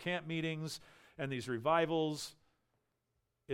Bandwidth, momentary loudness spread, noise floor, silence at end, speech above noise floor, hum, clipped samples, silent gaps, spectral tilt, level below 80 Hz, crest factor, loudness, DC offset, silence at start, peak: 16 kHz; 13 LU; -83 dBFS; 0 s; 47 dB; none; under 0.1%; none; -5 dB/octave; -74 dBFS; 22 dB; -37 LUFS; under 0.1%; 0 s; -18 dBFS